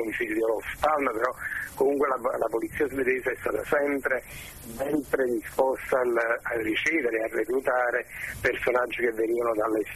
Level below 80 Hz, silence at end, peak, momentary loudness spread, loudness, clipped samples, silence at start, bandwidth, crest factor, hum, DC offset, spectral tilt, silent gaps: -54 dBFS; 0 s; -8 dBFS; 5 LU; -27 LUFS; under 0.1%; 0 s; 13.5 kHz; 18 dB; none; under 0.1%; -4.5 dB/octave; none